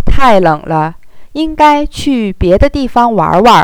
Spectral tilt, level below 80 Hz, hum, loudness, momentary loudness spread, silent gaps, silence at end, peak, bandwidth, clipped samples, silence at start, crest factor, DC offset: -6 dB/octave; -22 dBFS; none; -10 LUFS; 10 LU; none; 0 s; 0 dBFS; 17 kHz; 3%; 0 s; 8 dB; 2%